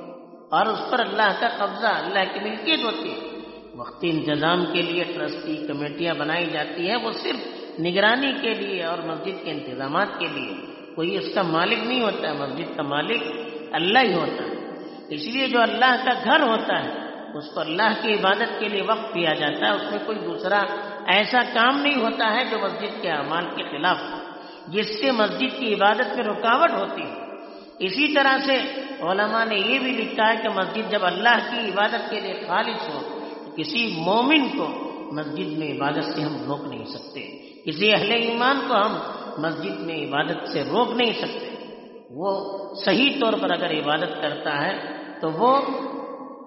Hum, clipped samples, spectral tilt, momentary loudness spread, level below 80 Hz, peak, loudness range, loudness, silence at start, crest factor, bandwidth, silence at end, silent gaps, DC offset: none; under 0.1%; -1.5 dB/octave; 14 LU; -70 dBFS; -4 dBFS; 4 LU; -23 LUFS; 0 s; 20 dB; 6 kHz; 0 s; none; under 0.1%